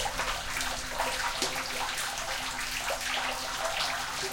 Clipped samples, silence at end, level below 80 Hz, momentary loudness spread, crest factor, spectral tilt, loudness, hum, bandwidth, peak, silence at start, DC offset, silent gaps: under 0.1%; 0 s; -48 dBFS; 2 LU; 20 dB; -0.5 dB/octave; -31 LUFS; none; 17 kHz; -12 dBFS; 0 s; under 0.1%; none